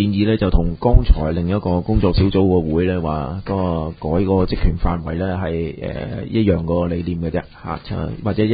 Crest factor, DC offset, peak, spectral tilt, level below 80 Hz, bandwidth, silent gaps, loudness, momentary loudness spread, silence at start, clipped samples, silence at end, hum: 18 dB; under 0.1%; 0 dBFS; -12.5 dB/octave; -24 dBFS; 5 kHz; none; -20 LUFS; 9 LU; 0 s; under 0.1%; 0 s; none